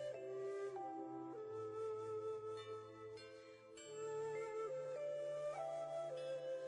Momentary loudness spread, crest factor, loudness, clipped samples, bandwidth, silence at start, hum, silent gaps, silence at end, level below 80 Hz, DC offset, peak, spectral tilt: 9 LU; 10 dB; -47 LUFS; under 0.1%; 11 kHz; 0 s; none; none; 0 s; -90 dBFS; under 0.1%; -36 dBFS; -5 dB/octave